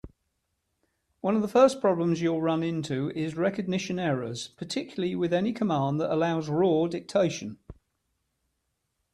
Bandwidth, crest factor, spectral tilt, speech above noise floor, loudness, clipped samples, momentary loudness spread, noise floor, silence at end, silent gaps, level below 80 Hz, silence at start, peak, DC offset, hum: 12.5 kHz; 20 dB; -6.5 dB/octave; 52 dB; -27 LUFS; under 0.1%; 11 LU; -79 dBFS; 1.4 s; none; -62 dBFS; 0.05 s; -8 dBFS; under 0.1%; none